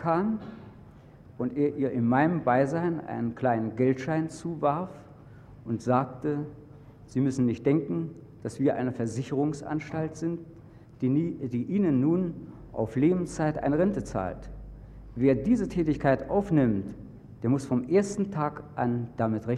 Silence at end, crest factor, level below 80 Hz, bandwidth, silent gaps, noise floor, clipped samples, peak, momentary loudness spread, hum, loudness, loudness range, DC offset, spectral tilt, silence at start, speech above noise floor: 0 s; 20 dB; -52 dBFS; 10.5 kHz; none; -50 dBFS; under 0.1%; -8 dBFS; 15 LU; none; -28 LUFS; 3 LU; under 0.1%; -8 dB/octave; 0 s; 24 dB